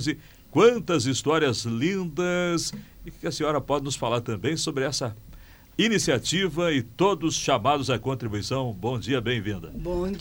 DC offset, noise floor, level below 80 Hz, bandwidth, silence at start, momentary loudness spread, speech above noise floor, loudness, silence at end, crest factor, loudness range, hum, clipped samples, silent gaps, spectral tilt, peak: under 0.1%; -47 dBFS; -48 dBFS; over 20 kHz; 0 s; 10 LU; 22 dB; -25 LUFS; 0 s; 18 dB; 3 LU; none; under 0.1%; none; -4.5 dB/octave; -8 dBFS